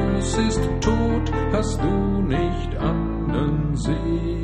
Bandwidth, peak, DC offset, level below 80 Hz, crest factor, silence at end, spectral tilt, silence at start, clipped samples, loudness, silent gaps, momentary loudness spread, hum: 11 kHz; -6 dBFS; under 0.1%; -28 dBFS; 16 dB; 0 s; -6.5 dB/octave; 0 s; under 0.1%; -23 LUFS; none; 3 LU; none